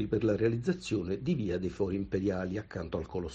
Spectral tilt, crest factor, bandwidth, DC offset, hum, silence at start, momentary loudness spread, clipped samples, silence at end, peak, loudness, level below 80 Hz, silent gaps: -7.5 dB/octave; 16 dB; 8.8 kHz; under 0.1%; none; 0 s; 8 LU; under 0.1%; 0 s; -16 dBFS; -33 LUFS; -52 dBFS; none